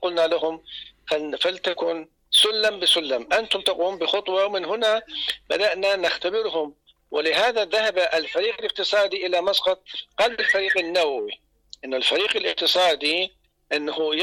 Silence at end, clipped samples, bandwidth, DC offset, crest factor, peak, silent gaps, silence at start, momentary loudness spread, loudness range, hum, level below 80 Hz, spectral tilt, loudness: 0 s; under 0.1%; 17.5 kHz; under 0.1%; 12 dB; -10 dBFS; none; 0 s; 10 LU; 2 LU; none; -62 dBFS; -1 dB/octave; -22 LUFS